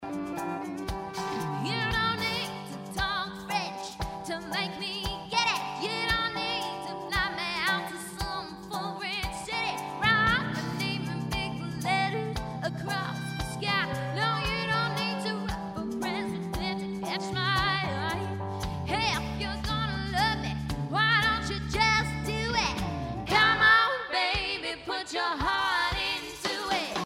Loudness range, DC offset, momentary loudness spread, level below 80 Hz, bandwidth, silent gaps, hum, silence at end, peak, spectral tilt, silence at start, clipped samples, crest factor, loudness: 6 LU; under 0.1%; 10 LU; -46 dBFS; 16 kHz; none; none; 0 s; -10 dBFS; -4 dB/octave; 0 s; under 0.1%; 20 dB; -29 LUFS